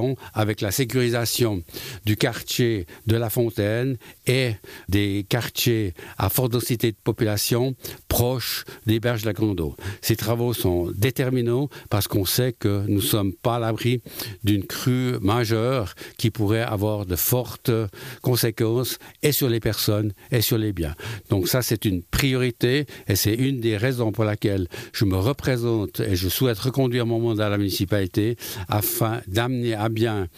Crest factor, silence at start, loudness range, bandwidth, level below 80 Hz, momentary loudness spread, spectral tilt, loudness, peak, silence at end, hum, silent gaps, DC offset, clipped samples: 16 dB; 0 s; 1 LU; 15.5 kHz; -46 dBFS; 5 LU; -5 dB/octave; -23 LUFS; -6 dBFS; 0.1 s; none; none; under 0.1%; under 0.1%